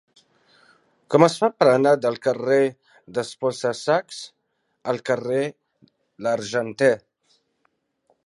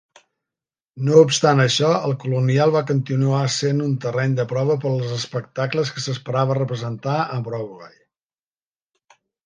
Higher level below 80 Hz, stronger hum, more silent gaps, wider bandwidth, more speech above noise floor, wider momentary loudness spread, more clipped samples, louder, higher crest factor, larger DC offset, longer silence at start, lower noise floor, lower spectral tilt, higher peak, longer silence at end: second, -72 dBFS vs -64 dBFS; neither; neither; first, 11.5 kHz vs 9.8 kHz; second, 50 dB vs over 71 dB; about the same, 13 LU vs 11 LU; neither; about the same, -22 LUFS vs -20 LUFS; about the same, 22 dB vs 20 dB; neither; first, 1.1 s vs 0.95 s; second, -70 dBFS vs under -90 dBFS; about the same, -5.5 dB/octave vs -5.5 dB/octave; about the same, 0 dBFS vs 0 dBFS; second, 1.3 s vs 1.55 s